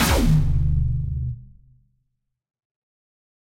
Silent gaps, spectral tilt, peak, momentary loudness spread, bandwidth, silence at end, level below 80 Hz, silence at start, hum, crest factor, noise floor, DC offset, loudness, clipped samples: none; -5.5 dB/octave; -6 dBFS; 13 LU; 16 kHz; 1.95 s; -26 dBFS; 0 s; none; 18 dB; -75 dBFS; under 0.1%; -22 LUFS; under 0.1%